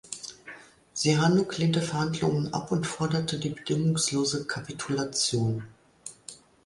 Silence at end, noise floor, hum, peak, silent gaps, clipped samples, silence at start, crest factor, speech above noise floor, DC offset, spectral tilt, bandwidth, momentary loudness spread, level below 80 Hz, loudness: 0.3 s; -49 dBFS; none; -10 dBFS; none; under 0.1%; 0.05 s; 18 dB; 22 dB; under 0.1%; -4.5 dB/octave; 11.5 kHz; 20 LU; -60 dBFS; -27 LUFS